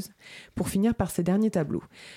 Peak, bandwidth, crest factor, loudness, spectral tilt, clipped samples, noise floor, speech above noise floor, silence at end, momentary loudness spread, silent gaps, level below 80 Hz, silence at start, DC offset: -12 dBFS; 16.5 kHz; 16 dB; -27 LUFS; -6.5 dB/octave; under 0.1%; -48 dBFS; 21 dB; 0 s; 16 LU; none; -50 dBFS; 0 s; under 0.1%